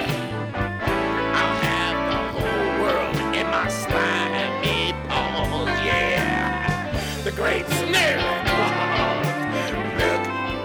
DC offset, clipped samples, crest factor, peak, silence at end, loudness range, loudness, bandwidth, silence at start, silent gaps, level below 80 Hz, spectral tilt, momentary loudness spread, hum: under 0.1%; under 0.1%; 16 dB; -8 dBFS; 0 s; 1 LU; -22 LUFS; over 20 kHz; 0 s; none; -38 dBFS; -4.5 dB/octave; 5 LU; none